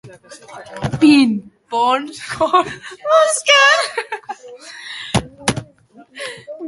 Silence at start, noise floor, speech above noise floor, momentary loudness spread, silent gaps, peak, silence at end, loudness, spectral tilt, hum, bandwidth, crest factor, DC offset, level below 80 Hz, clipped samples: 0.05 s; -46 dBFS; 31 dB; 22 LU; none; 0 dBFS; 0 s; -15 LUFS; -3.5 dB/octave; none; 11.5 kHz; 18 dB; under 0.1%; -48 dBFS; under 0.1%